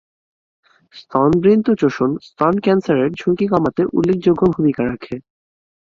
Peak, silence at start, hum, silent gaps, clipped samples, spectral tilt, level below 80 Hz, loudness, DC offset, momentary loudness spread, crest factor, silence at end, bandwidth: -2 dBFS; 0.95 s; none; none; under 0.1%; -8.5 dB/octave; -50 dBFS; -17 LUFS; under 0.1%; 9 LU; 16 dB; 0.75 s; 7.2 kHz